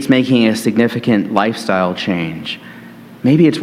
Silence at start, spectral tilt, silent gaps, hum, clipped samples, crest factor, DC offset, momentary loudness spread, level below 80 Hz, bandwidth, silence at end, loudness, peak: 0 s; -6 dB/octave; none; none; under 0.1%; 14 dB; under 0.1%; 13 LU; -56 dBFS; 15.5 kHz; 0 s; -15 LUFS; 0 dBFS